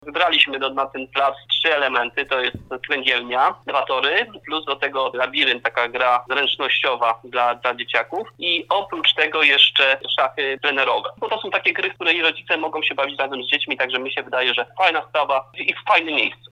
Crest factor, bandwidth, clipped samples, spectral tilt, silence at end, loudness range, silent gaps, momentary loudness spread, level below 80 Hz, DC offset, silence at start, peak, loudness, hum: 20 dB; 11.5 kHz; under 0.1%; -3.5 dB/octave; 0.2 s; 3 LU; none; 7 LU; -62 dBFS; under 0.1%; 0.05 s; 0 dBFS; -19 LUFS; none